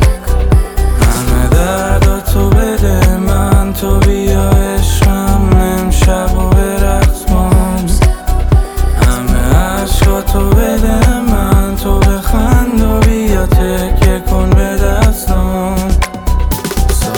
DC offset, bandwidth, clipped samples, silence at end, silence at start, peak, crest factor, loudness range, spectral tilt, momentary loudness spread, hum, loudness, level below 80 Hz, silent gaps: under 0.1%; 20 kHz; under 0.1%; 0 s; 0 s; 0 dBFS; 8 dB; 1 LU; -6 dB/octave; 3 LU; none; -12 LUFS; -12 dBFS; none